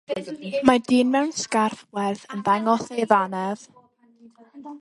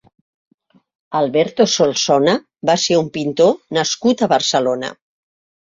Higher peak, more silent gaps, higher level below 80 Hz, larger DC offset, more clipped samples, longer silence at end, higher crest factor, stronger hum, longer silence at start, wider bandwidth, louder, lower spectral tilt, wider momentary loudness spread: about the same, 0 dBFS vs -2 dBFS; neither; about the same, -64 dBFS vs -62 dBFS; neither; neither; second, 0.05 s vs 0.75 s; first, 22 dB vs 16 dB; neither; second, 0.1 s vs 1.1 s; first, 11.5 kHz vs 7.8 kHz; second, -23 LUFS vs -16 LUFS; about the same, -4.5 dB/octave vs -3.5 dB/octave; first, 11 LU vs 6 LU